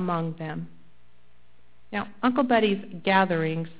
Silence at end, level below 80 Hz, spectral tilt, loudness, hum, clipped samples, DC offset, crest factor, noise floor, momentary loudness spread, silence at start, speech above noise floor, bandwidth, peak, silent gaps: 0.1 s; -60 dBFS; -10 dB/octave; -25 LUFS; 60 Hz at -65 dBFS; under 0.1%; 0.7%; 22 dB; -63 dBFS; 13 LU; 0 s; 37 dB; 4 kHz; -6 dBFS; none